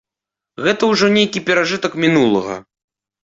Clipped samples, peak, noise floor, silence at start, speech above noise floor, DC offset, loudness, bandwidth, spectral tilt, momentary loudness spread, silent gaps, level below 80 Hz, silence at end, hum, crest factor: under 0.1%; -2 dBFS; -86 dBFS; 0.6 s; 70 dB; under 0.1%; -15 LUFS; 7.8 kHz; -4.5 dB/octave; 7 LU; none; -56 dBFS; 0.6 s; none; 14 dB